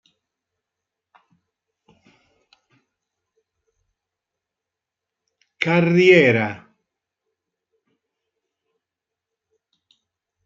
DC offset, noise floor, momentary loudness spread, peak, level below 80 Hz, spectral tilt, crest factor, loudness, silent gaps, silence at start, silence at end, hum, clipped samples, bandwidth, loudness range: under 0.1%; -86 dBFS; 15 LU; -2 dBFS; -68 dBFS; -7 dB/octave; 24 dB; -16 LUFS; none; 5.6 s; 3.9 s; none; under 0.1%; 7.6 kHz; 8 LU